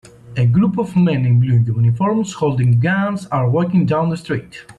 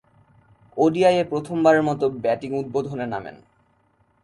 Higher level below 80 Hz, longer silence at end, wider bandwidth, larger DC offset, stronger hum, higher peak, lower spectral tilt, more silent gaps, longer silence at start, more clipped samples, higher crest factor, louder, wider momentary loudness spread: first, -50 dBFS vs -60 dBFS; second, 0.05 s vs 0.9 s; second, 9.8 kHz vs 11.5 kHz; neither; neither; about the same, -6 dBFS vs -6 dBFS; first, -8 dB/octave vs -6.5 dB/octave; neither; second, 0.25 s vs 0.75 s; neither; second, 10 dB vs 18 dB; first, -16 LUFS vs -21 LUFS; second, 6 LU vs 13 LU